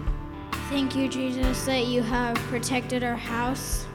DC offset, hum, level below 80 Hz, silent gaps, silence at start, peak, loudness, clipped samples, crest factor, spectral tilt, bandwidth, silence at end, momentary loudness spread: under 0.1%; none; -36 dBFS; none; 0 s; -12 dBFS; -27 LUFS; under 0.1%; 16 dB; -4.5 dB/octave; 18.5 kHz; 0 s; 7 LU